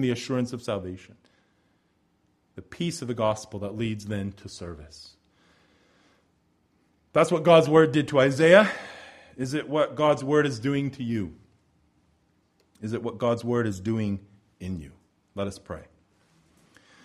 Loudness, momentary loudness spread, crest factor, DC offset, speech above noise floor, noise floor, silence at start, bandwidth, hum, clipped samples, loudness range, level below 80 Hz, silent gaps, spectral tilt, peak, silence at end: -25 LUFS; 23 LU; 24 dB; under 0.1%; 44 dB; -69 dBFS; 0 s; 12.5 kHz; none; under 0.1%; 13 LU; -60 dBFS; none; -6 dB/octave; -2 dBFS; 1.25 s